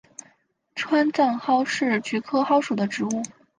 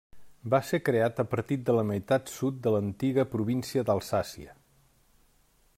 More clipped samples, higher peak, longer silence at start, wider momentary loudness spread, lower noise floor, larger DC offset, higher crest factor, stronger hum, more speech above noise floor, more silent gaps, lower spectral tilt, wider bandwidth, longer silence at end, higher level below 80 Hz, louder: neither; first, -8 dBFS vs -12 dBFS; first, 0.75 s vs 0.15 s; first, 11 LU vs 5 LU; about the same, -63 dBFS vs -65 dBFS; neither; about the same, 16 dB vs 18 dB; neither; about the same, 40 dB vs 37 dB; neither; second, -4.5 dB/octave vs -6.5 dB/octave; second, 10 kHz vs 16 kHz; second, 0.3 s vs 1.25 s; second, -72 dBFS vs -62 dBFS; first, -23 LUFS vs -29 LUFS